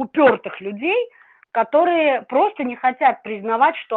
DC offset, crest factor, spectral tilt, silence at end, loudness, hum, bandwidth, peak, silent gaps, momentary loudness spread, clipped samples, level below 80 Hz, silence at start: under 0.1%; 16 dB; -7.5 dB/octave; 0 s; -19 LUFS; none; 4.4 kHz; -4 dBFS; none; 10 LU; under 0.1%; -70 dBFS; 0 s